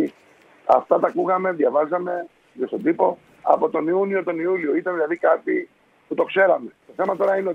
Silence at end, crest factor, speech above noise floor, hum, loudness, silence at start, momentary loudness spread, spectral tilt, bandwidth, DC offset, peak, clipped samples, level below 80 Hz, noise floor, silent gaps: 0 s; 20 dB; 33 dB; none; -21 LUFS; 0 s; 11 LU; -8 dB/octave; 6 kHz; under 0.1%; 0 dBFS; under 0.1%; -72 dBFS; -53 dBFS; none